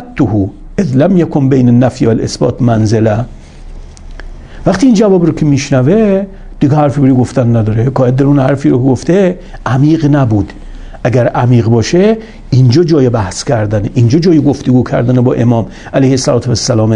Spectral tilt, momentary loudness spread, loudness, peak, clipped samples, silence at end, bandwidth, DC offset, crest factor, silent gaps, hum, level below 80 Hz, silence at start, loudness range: -7 dB/octave; 7 LU; -10 LUFS; 0 dBFS; 0.2%; 0 s; 10.5 kHz; under 0.1%; 10 dB; none; none; -30 dBFS; 0 s; 2 LU